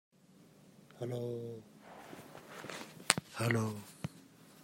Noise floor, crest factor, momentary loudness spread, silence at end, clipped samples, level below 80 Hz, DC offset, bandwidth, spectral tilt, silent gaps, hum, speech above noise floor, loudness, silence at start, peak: -63 dBFS; 40 dB; 22 LU; 0 s; under 0.1%; -76 dBFS; under 0.1%; 16 kHz; -4 dB/octave; none; none; 26 dB; -38 LUFS; 0.4 s; 0 dBFS